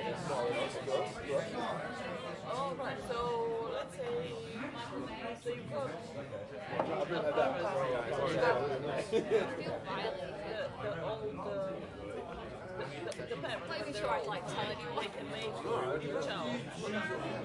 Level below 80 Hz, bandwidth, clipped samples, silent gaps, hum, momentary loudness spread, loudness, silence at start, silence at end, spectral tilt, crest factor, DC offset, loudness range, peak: -64 dBFS; 11.5 kHz; under 0.1%; none; none; 9 LU; -37 LUFS; 0 s; 0 s; -5 dB/octave; 18 dB; under 0.1%; 7 LU; -18 dBFS